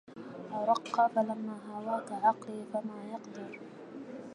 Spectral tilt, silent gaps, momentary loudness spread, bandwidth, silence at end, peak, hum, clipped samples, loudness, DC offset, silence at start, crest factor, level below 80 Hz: -6 dB/octave; none; 17 LU; 11 kHz; 0 s; -14 dBFS; none; under 0.1%; -33 LUFS; under 0.1%; 0.1 s; 20 dB; -86 dBFS